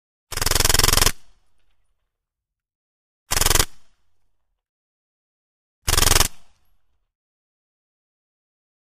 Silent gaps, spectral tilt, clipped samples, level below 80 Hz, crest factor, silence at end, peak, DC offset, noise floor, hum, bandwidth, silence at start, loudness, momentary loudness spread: 2.75-3.26 s, 4.69-5.82 s; -1.5 dB/octave; under 0.1%; -30 dBFS; 24 dB; 2.45 s; 0 dBFS; under 0.1%; -86 dBFS; none; 15.5 kHz; 0.3 s; -18 LUFS; 11 LU